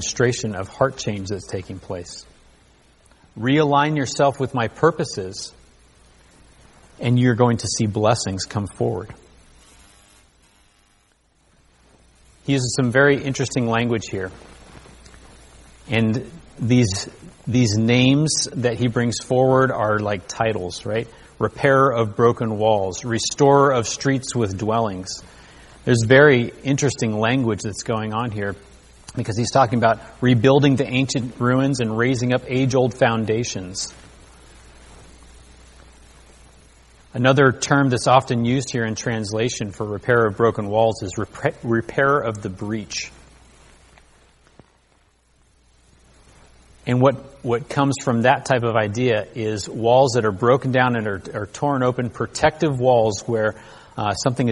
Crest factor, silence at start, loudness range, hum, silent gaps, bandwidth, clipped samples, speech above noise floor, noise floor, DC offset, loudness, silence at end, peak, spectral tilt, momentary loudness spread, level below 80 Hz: 20 dB; 0 s; 7 LU; none; none; 11.5 kHz; under 0.1%; 41 dB; -60 dBFS; under 0.1%; -20 LUFS; 0 s; 0 dBFS; -5.5 dB/octave; 13 LU; -50 dBFS